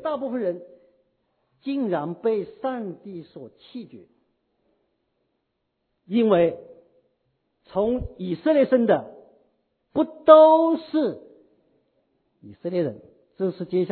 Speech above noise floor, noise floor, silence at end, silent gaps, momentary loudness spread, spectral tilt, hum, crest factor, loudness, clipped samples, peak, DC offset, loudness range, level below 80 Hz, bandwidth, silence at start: 55 dB; -76 dBFS; 0 s; none; 24 LU; -11 dB/octave; none; 24 dB; -22 LUFS; under 0.1%; 0 dBFS; under 0.1%; 12 LU; -54 dBFS; 4.5 kHz; 0.05 s